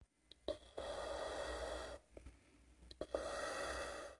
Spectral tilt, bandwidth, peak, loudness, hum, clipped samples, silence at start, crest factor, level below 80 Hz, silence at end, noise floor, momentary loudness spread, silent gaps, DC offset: -3 dB/octave; 11.5 kHz; -24 dBFS; -46 LUFS; none; under 0.1%; 0 s; 24 dB; -60 dBFS; 0 s; -67 dBFS; 18 LU; none; under 0.1%